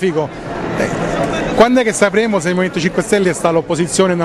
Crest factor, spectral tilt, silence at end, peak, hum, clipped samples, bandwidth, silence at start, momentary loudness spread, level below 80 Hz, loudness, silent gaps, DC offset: 14 dB; -5 dB/octave; 0 s; 0 dBFS; none; under 0.1%; 13 kHz; 0 s; 8 LU; -40 dBFS; -15 LUFS; none; under 0.1%